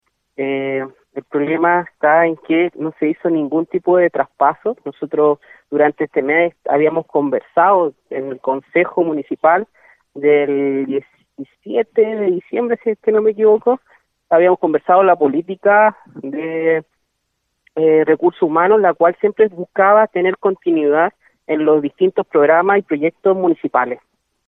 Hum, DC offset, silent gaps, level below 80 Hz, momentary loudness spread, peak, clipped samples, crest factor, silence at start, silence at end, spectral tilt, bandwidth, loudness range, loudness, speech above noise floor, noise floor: none; under 0.1%; none; -70 dBFS; 11 LU; 0 dBFS; under 0.1%; 14 dB; 0.4 s; 0.5 s; -9.5 dB/octave; 3.8 kHz; 3 LU; -16 LUFS; 56 dB; -71 dBFS